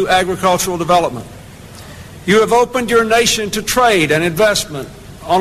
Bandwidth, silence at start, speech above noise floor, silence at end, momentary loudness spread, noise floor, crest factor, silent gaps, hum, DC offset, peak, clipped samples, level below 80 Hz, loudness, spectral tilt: 14 kHz; 0 s; 21 dB; 0 s; 21 LU; -35 dBFS; 12 dB; none; none; under 0.1%; -4 dBFS; under 0.1%; -40 dBFS; -14 LUFS; -3.5 dB/octave